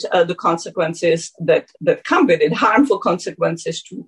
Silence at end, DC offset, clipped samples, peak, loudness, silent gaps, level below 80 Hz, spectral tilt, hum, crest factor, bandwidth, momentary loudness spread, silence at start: 0.05 s; under 0.1%; under 0.1%; -4 dBFS; -18 LUFS; none; -62 dBFS; -5 dB/octave; none; 14 dB; 11 kHz; 7 LU; 0 s